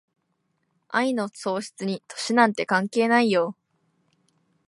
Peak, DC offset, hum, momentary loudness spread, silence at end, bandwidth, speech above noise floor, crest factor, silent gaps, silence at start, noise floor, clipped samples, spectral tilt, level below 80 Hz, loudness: -4 dBFS; under 0.1%; none; 11 LU; 1.15 s; 11.5 kHz; 50 dB; 22 dB; none; 0.9 s; -73 dBFS; under 0.1%; -4.5 dB/octave; -78 dBFS; -24 LUFS